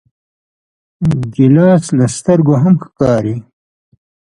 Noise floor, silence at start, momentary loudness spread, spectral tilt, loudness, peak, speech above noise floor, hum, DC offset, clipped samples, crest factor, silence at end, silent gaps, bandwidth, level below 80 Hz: under -90 dBFS; 1 s; 8 LU; -8 dB/octave; -12 LUFS; 0 dBFS; over 79 dB; none; under 0.1%; under 0.1%; 14 dB; 0.95 s; none; 11.5 kHz; -44 dBFS